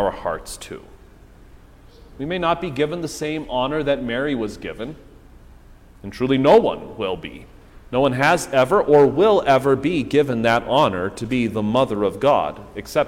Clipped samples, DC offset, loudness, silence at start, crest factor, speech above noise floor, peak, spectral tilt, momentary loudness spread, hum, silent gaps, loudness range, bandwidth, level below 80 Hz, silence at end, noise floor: under 0.1%; under 0.1%; -19 LUFS; 0 s; 18 dB; 26 dB; -2 dBFS; -5.5 dB/octave; 17 LU; none; none; 9 LU; 16 kHz; -44 dBFS; 0 s; -46 dBFS